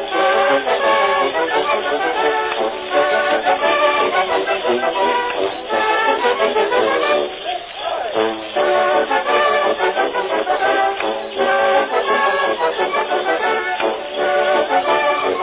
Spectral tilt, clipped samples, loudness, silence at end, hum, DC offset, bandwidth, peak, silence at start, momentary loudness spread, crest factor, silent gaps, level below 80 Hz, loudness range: -6.5 dB/octave; under 0.1%; -17 LUFS; 0 s; none; under 0.1%; 4 kHz; -2 dBFS; 0 s; 5 LU; 14 dB; none; -56 dBFS; 1 LU